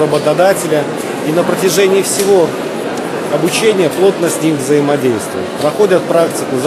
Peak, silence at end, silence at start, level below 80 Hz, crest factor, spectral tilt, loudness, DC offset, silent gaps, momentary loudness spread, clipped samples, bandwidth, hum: 0 dBFS; 0 s; 0 s; -56 dBFS; 12 dB; -4.5 dB/octave; -13 LUFS; under 0.1%; none; 8 LU; under 0.1%; 15 kHz; none